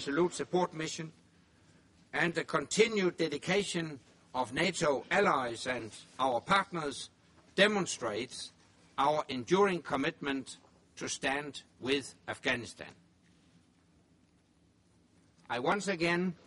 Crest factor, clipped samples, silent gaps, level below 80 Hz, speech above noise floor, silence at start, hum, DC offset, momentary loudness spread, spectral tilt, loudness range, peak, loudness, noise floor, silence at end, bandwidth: 24 dB; under 0.1%; none; -68 dBFS; 35 dB; 0 s; none; under 0.1%; 15 LU; -4 dB/octave; 8 LU; -10 dBFS; -32 LUFS; -68 dBFS; 0.1 s; 11.5 kHz